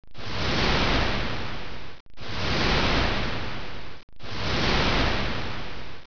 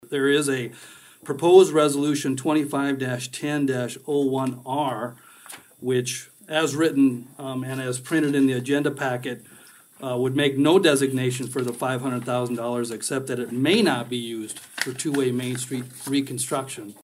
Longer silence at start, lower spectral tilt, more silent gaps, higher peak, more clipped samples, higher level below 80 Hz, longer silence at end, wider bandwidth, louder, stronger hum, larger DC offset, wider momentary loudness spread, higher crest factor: about the same, 0 s vs 0.1 s; about the same, -5 dB/octave vs -5 dB/octave; first, 2.00-2.06 s, 4.03-4.08 s vs none; second, -10 dBFS vs -2 dBFS; neither; first, -34 dBFS vs -72 dBFS; about the same, 0 s vs 0.1 s; second, 5.4 kHz vs 16 kHz; second, -26 LUFS vs -23 LUFS; neither; first, 4% vs under 0.1%; first, 18 LU vs 14 LU; about the same, 16 dB vs 20 dB